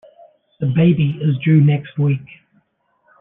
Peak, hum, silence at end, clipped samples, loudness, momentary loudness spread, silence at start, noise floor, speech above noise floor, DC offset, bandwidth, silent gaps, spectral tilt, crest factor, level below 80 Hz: -4 dBFS; none; 0.95 s; under 0.1%; -17 LUFS; 8 LU; 0.6 s; -63 dBFS; 48 dB; under 0.1%; 3.8 kHz; none; -12 dB/octave; 14 dB; -54 dBFS